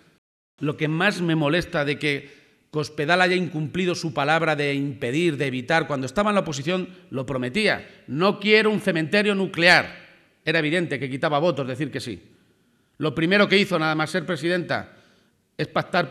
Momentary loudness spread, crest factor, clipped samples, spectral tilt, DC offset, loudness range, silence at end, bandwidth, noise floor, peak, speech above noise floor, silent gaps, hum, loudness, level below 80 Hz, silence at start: 12 LU; 20 dB; under 0.1%; -5.5 dB/octave; under 0.1%; 4 LU; 0 s; 13.5 kHz; -63 dBFS; -2 dBFS; 41 dB; none; none; -22 LUFS; -58 dBFS; 0.6 s